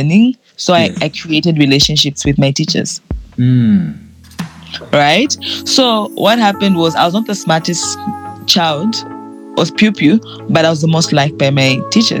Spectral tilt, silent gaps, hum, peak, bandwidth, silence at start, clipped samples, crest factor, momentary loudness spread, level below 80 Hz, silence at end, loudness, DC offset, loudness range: -4.5 dB/octave; none; none; 0 dBFS; 19 kHz; 0 s; under 0.1%; 12 dB; 11 LU; -38 dBFS; 0 s; -12 LUFS; under 0.1%; 2 LU